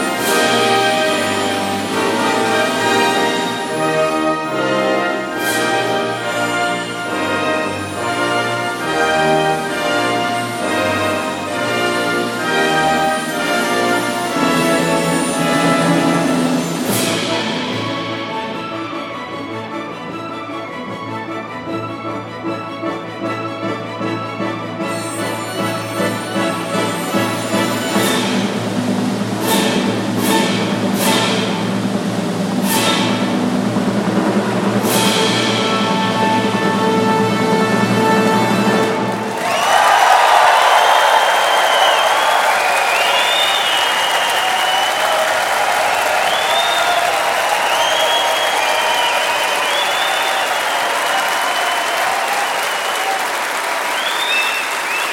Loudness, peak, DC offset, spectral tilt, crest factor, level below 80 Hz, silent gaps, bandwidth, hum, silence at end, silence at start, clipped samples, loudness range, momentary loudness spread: -16 LUFS; 0 dBFS; under 0.1%; -3.5 dB/octave; 16 dB; -56 dBFS; none; 17 kHz; none; 0 s; 0 s; under 0.1%; 10 LU; 10 LU